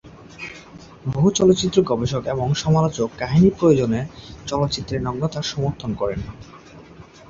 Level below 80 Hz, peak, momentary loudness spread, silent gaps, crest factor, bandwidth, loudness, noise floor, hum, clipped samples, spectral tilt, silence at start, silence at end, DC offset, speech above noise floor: -44 dBFS; -2 dBFS; 19 LU; none; 18 dB; 7.8 kHz; -20 LUFS; -43 dBFS; none; under 0.1%; -6 dB/octave; 0.05 s; 0.25 s; under 0.1%; 24 dB